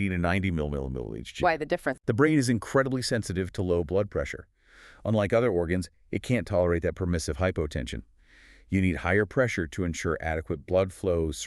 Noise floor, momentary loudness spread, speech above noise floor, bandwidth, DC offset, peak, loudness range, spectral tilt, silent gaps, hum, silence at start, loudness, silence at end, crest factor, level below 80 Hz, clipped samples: -55 dBFS; 10 LU; 28 dB; 13 kHz; under 0.1%; -8 dBFS; 2 LU; -6 dB/octave; none; none; 0 s; -28 LUFS; 0 s; 18 dB; -44 dBFS; under 0.1%